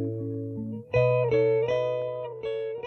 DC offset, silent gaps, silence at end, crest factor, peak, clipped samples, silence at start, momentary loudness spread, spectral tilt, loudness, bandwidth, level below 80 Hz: under 0.1%; none; 0 s; 14 dB; -12 dBFS; under 0.1%; 0 s; 11 LU; -8.5 dB/octave; -27 LUFS; 6.4 kHz; -56 dBFS